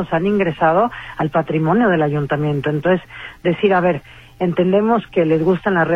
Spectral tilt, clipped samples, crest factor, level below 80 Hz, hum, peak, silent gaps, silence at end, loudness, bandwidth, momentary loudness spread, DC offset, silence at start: -9 dB/octave; under 0.1%; 14 dB; -46 dBFS; none; -4 dBFS; none; 0 s; -17 LUFS; 6.8 kHz; 6 LU; under 0.1%; 0 s